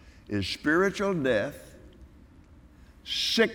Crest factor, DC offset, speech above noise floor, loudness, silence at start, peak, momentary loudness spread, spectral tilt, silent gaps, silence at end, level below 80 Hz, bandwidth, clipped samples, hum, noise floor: 20 dB; under 0.1%; 27 dB; -27 LUFS; 0.05 s; -10 dBFS; 12 LU; -4.5 dB/octave; none; 0 s; -54 dBFS; 18 kHz; under 0.1%; none; -53 dBFS